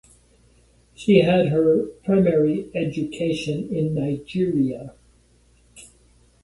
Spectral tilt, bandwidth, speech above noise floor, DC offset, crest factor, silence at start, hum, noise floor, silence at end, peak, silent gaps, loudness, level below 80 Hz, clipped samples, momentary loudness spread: -7.5 dB/octave; 11.5 kHz; 37 dB; under 0.1%; 20 dB; 1 s; none; -57 dBFS; 0.65 s; -2 dBFS; none; -21 LUFS; -54 dBFS; under 0.1%; 9 LU